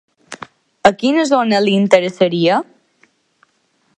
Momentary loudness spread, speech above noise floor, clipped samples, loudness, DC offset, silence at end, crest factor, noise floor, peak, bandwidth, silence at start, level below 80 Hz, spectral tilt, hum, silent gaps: 21 LU; 48 dB; under 0.1%; -14 LUFS; under 0.1%; 1.35 s; 16 dB; -62 dBFS; 0 dBFS; 10.5 kHz; 0.3 s; -58 dBFS; -5.5 dB/octave; none; none